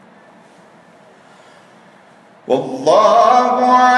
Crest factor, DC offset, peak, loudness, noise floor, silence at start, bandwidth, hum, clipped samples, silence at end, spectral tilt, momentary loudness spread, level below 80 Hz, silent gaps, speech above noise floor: 14 dB; under 0.1%; -2 dBFS; -12 LUFS; -46 dBFS; 2.5 s; 10.5 kHz; none; under 0.1%; 0 s; -4 dB/octave; 9 LU; -64 dBFS; none; 34 dB